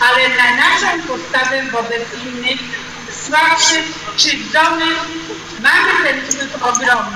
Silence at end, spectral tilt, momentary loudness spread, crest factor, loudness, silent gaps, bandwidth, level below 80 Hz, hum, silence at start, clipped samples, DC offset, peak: 0 s; -0.5 dB/octave; 14 LU; 14 dB; -13 LUFS; none; 16 kHz; -50 dBFS; none; 0 s; under 0.1%; under 0.1%; 0 dBFS